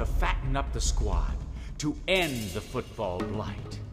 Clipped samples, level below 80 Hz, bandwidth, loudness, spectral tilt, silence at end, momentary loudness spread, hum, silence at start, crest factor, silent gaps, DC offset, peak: under 0.1%; -32 dBFS; 15.5 kHz; -31 LUFS; -4.5 dB/octave; 0 s; 10 LU; none; 0 s; 18 dB; none; under 0.1%; -10 dBFS